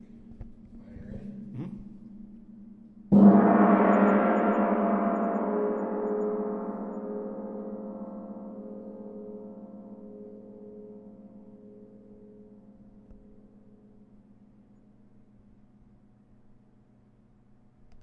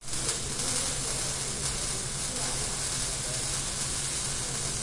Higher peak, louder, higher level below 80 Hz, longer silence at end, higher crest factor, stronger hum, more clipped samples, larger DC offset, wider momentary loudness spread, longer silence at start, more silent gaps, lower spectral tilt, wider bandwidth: first, -6 dBFS vs -14 dBFS; first, -25 LUFS vs -29 LUFS; second, -58 dBFS vs -44 dBFS; first, 4.9 s vs 0 s; first, 24 dB vs 16 dB; neither; neither; neither; first, 27 LU vs 2 LU; first, 0.15 s vs 0 s; neither; first, -11 dB/octave vs -1.5 dB/octave; second, 3.4 kHz vs 11.5 kHz